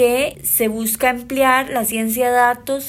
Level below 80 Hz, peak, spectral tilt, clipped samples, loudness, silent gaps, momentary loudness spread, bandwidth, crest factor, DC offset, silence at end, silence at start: -48 dBFS; -2 dBFS; -2.5 dB/octave; under 0.1%; -17 LUFS; none; 4 LU; 16.5 kHz; 16 dB; under 0.1%; 0 s; 0 s